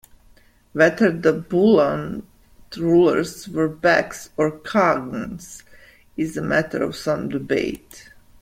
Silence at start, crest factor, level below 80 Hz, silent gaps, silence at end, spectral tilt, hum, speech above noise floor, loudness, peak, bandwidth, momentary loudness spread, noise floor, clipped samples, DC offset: 0.75 s; 18 dB; -52 dBFS; none; 0.4 s; -6 dB/octave; none; 33 dB; -20 LUFS; -4 dBFS; 16 kHz; 17 LU; -53 dBFS; under 0.1%; under 0.1%